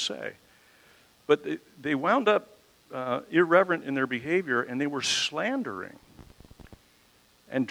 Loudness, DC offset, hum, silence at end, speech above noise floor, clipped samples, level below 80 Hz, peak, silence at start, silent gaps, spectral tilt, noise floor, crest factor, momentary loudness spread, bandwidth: -27 LUFS; under 0.1%; none; 0 s; 34 dB; under 0.1%; -66 dBFS; -6 dBFS; 0 s; none; -4 dB/octave; -62 dBFS; 24 dB; 15 LU; 16 kHz